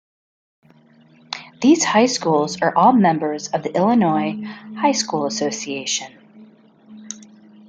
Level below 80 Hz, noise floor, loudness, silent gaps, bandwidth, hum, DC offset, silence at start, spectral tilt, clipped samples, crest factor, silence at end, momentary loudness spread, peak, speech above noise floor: -66 dBFS; -51 dBFS; -18 LUFS; none; 9.6 kHz; none; under 0.1%; 1.3 s; -4 dB/octave; under 0.1%; 18 dB; 0.45 s; 18 LU; -2 dBFS; 33 dB